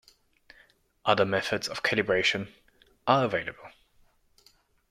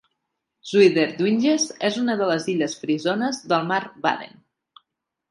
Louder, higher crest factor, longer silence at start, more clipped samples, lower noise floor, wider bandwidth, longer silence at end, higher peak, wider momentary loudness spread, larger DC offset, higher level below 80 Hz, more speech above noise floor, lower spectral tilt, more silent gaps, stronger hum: second, -27 LUFS vs -22 LUFS; about the same, 22 dB vs 20 dB; first, 1.05 s vs 0.65 s; neither; second, -64 dBFS vs -79 dBFS; first, 15.5 kHz vs 11.5 kHz; first, 1.2 s vs 1.05 s; second, -8 dBFS vs -4 dBFS; first, 13 LU vs 8 LU; neither; first, -64 dBFS vs -72 dBFS; second, 37 dB vs 58 dB; about the same, -4.5 dB/octave vs -4.5 dB/octave; neither; neither